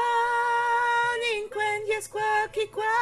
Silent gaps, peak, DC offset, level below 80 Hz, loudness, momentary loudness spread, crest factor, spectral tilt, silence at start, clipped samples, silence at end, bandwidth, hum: none; -14 dBFS; under 0.1%; -62 dBFS; -25 LUFS; 5 LU; 12 dB; -1.5 dB/octave; 0 s; under 0.1%; 0 s; 13.5 kHz; none